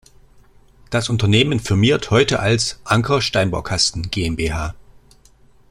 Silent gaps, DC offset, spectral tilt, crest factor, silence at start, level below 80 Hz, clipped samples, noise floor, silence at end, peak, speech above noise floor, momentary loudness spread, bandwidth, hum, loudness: none; under 0.1%; -4.5 dB/octave; 18 dB; 0.9 s; -38 dBFS; under 0.1%; -50 dBFS; 0.95 s; 0 dBFS; 33 dB; 8 LU; 13.5 kHz; none; -18 LUFS